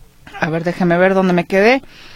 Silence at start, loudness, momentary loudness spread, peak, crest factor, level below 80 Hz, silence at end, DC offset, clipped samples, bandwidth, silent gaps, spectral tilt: 0.35 s; -15 LUFS; 7 LU; 0 dBFS; 16 dB; -44 dBFS; 0 s; under 0.1%; under 0.1%; 13 kHz; none; -7 dB/octave